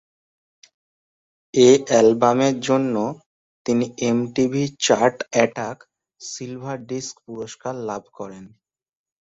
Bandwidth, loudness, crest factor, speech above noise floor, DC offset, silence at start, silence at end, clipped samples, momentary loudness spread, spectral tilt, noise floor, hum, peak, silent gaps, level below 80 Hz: 8 kHz; -20 LUFS; 20 dB; over 70 dB; under 0.1%; 1.55 s; 0.75 s; under 0.1%; 19 LU; -4.5 dB/octave; under -90 dBFS; none; -2 dBFS; 3.26-3.65 s; -62 dBFS